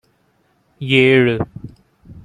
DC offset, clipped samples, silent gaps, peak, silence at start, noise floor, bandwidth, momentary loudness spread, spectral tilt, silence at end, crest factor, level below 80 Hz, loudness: under 0.1%; under 0.1%; none; 0 dBFS; 0.8 s; -60 dBFS; 9.6 kHz; 19 LU; -7 dB/octave; 0.05 s; 18 dB; -50 dBFS; -15 LUFS